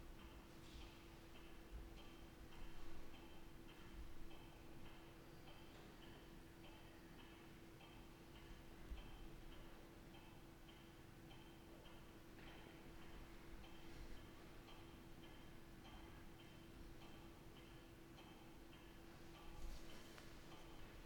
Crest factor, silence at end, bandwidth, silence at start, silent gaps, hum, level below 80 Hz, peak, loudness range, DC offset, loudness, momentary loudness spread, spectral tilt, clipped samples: 16 dB; 0 s; 19 kHz; 0 s; none; none; -62 dBFS; -40 dBFS; 1 LU; under 0.1%; -61 LUFS; 3 LU; -5 dB/octave; under 0.1%